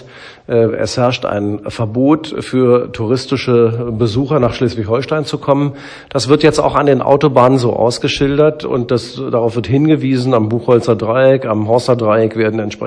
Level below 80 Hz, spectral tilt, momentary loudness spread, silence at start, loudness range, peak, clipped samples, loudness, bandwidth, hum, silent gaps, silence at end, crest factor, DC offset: -42 dBFS; -6.5 dB/octave; 7 LU; 0 s; 3 LU; 0 dBFS; 0.3%; -14 LUFS; 10.5 kHz; none; none; 0 s; 14 dB; under 0.1%